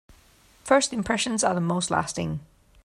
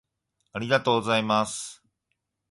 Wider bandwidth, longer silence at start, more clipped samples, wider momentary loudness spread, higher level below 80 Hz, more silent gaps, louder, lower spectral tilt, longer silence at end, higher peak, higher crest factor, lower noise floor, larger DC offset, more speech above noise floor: first, 13.5 kHz vs 11.5 kHz; about the same, 0.65 s vs 0.55 s; neither; second, 11 LU vs 15 LU; first, -54 dBFS vs -64 dBFS; neither; about the same, -25 LUFS vs -25 LUFS; about the same, -4 dB/octave vs -4 dB/octave; second, 0.4 s vs 0.8 s; about the same, -6 dBFS vs -8 dBFS; about the same, 20 dB vs 20 dB; second, -57 dBFS vs -80 dBFS; neither; second, 33 dB vs 55 dB